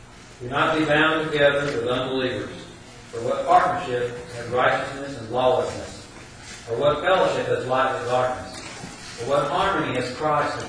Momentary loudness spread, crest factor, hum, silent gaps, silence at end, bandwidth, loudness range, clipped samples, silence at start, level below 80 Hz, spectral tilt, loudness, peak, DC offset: 18 LU; 18 dB; none; none; 0 s; 10.5 kHz; 2 LU; under 0.1%; 0 s; -50 dBFS; -5 dB/octave; -22 LUFS; -6 dBFS; under 0.1%